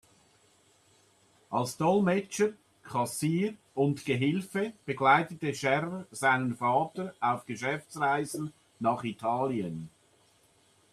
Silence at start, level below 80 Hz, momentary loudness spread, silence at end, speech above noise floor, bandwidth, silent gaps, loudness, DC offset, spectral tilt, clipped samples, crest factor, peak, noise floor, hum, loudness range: 1.5 s; -72 dBFS; 9 LU; 1.05 s; 36 dB; 14 kHz; none; -30 LUFS; under 0.1%; -5.5 dB/octave; under 0.1%; 20 dB; -10 dBFS; -65 dBFS; none; 4 LU